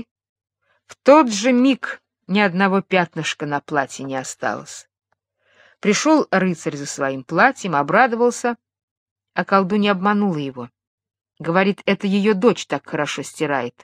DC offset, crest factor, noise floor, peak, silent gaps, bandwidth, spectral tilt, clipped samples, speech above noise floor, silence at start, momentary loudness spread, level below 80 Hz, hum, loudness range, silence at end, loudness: under 0.1%; 20 dB; -67 dBFS; 0 dBFS; 8.83-9.16 s, 10.87-10.98 s; 13 kHz; -5 dB/octave; under 0.1%; 48 dB; 0.9 s; 12 LU; -68 dBFS; none; 4 LU; 0.15 s; -19 LUFS